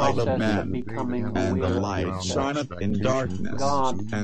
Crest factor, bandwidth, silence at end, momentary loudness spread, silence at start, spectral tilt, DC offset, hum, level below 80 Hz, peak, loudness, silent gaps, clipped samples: 16 dB; 9 kHz; 0 s; 5 LU; 0 s; -6 dB/octave; 2%; none; -42 dBFS; -8 dBFS; -26 LUFS; none; under 0.1%